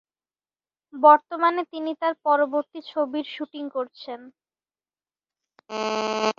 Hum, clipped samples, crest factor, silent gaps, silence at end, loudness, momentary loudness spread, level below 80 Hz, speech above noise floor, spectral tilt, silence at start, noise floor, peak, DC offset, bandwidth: none; under 0.1%; 22 dB; none; 0.05 s; -23 LUFS; 19 LU; -78 dBFS; over 67 dB; -3.5 dB/octave; 0.95 s; under -90 dBFS; -2 dBFS; under 0.1%; 7.4 kHz